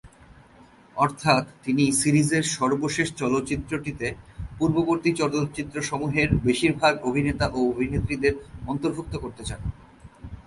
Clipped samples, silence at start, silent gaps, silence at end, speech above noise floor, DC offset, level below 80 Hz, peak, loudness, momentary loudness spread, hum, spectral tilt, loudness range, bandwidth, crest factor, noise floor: under 0.1%; 0.05 s; none; 0.05 s; 28 dB; under 0.1%; -42 dBFS; -6 dBFS; -24 LUFS; 12 LU; none; -5 dB/octave; 3 LU; 12 kHz; 20 dB; -52 dBFS